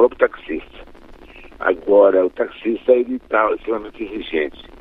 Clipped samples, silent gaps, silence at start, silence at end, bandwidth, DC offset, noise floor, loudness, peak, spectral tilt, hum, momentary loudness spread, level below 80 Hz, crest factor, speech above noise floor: under 0.1%; none; 0 s; 0.2 s; 4.1 kHz; under 0.1%; -41 dBFS; -19 LUFS; 0 dBFS; -7 dB/octave; none; 15 LU; -46 dBFS; 18 dB; 23 dB